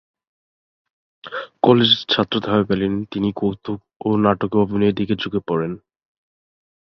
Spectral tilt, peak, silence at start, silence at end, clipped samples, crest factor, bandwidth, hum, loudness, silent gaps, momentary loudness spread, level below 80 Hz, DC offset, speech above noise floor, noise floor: -7.5 dB/octave; -2 dBFS; 1.25 s; 1.1 s; under 0.1%; 20 dB; 6.2 kHz; none; -19 LUFS; 3.96-4.00 s; 15 LU; -52 dBFS; under 0.1%; over 71 dB; under -90 dBFS